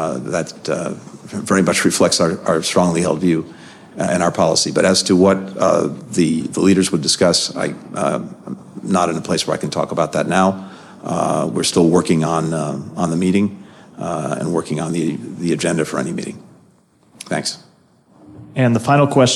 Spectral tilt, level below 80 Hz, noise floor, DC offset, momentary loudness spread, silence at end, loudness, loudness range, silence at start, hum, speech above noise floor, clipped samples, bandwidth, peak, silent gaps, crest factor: -4.5 dB/octave; -54 dBFS; -53 dBFS; under 0.1%; 14 LU; 0 s; -17 LUFS; 7 LU; 0 s; none; 36 dB; under 0.1%; 13.5 kHz; -2 dBFS; none; 16 dB